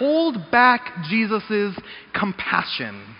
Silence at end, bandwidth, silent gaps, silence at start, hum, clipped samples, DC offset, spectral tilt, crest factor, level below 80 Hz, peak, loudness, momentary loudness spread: 0 s; 5.4 kHz; none; 0 s; none; under 0.1%; under 0.1%; -2.5 dB/octave; 20 dB; -58 dBFS; -2 dBFS; -21 LUFS; 12 LU